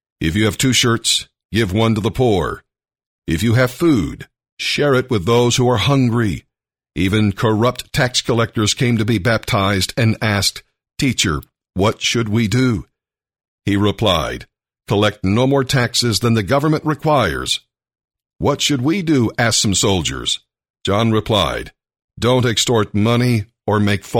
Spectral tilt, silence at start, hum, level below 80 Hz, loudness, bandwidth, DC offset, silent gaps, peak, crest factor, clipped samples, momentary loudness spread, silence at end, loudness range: -4.5 dB/octave; 0.2 s; none; -40 dBFS; -17 LUFS; 16.5 kHz; under 0.1%; 1.45-1.49 s, 3.06-3.22 s, 4.52-4.57 s, 13.48-13.58 s, 20.70-20.74 s, 22.04-22.08 s; -2 dBFS; 14 dB; under 0.1%; 8 LU; 0 s; 2 LU